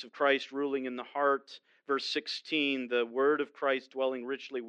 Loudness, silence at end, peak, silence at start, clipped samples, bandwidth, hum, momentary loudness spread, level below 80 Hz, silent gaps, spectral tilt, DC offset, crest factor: -32 LUFS; 0 s; -14 dBFS; 0 s; under 0.1%; 9 kHz; none; 8 LU; under -90 dBFS; none; -3.5 dB/octave; under 0.1%; 18 dB